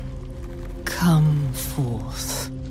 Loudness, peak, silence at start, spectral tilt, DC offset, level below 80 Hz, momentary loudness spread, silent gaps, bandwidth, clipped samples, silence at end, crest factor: -23 LUFS; -8 dBFS; 0 s; -5.5 dB/octave; under 0.1%; -36 dBFS; 17 LU; none; 16 kHz; under 0.1%; 0 s; 16 dB